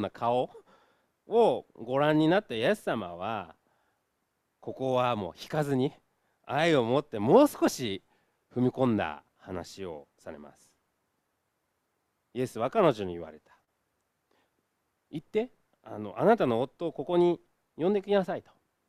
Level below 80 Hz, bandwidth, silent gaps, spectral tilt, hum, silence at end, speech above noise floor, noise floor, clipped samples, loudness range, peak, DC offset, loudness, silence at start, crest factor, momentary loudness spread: -68 dBFS; 15 kHz; none; -6 dB/octave; none; 0.5 s; 51 dB; -79 dBFS; under 0.1%; 8 LU; -8 dBFS; under 0.1%; -28 LUFS; 0 s; 22 dB; 18 LU